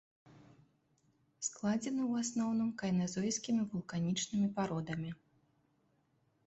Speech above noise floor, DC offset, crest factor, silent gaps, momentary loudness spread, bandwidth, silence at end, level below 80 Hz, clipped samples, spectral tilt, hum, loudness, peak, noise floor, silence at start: 40 dB; under 0.1%; 14 dB; none; 7 LU; 8.2 kHz; 1.35 s; -72 dBFS; under 0.1%; -5 dB/octave; none; -36 LUFS; -24 dBFS; -76 dBFS; 0.25 s